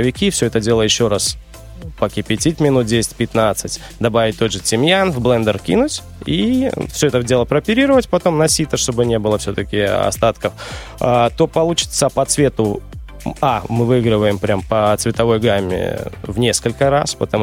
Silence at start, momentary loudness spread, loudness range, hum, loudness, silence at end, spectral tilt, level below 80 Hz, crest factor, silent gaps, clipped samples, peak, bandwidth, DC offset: 0 s; 8 LU; 2 LU; none; -16 LUFS; 0 s; -4.5 dB/octave; -36 dBFS; 14 dB; none; under 0.1%; -2 dBFS; 16.5 kHz; under 0.1%